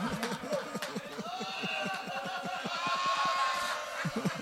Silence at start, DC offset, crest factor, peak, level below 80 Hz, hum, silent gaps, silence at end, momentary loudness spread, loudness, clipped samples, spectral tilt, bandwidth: 0 s; under 0.1%; 18 dB; -16 dBFS; -68 dBFS; none; none; 0 s; 8 LU; -34 LUFS; under 0.1%; -3.5 dB/octave; 16 kHz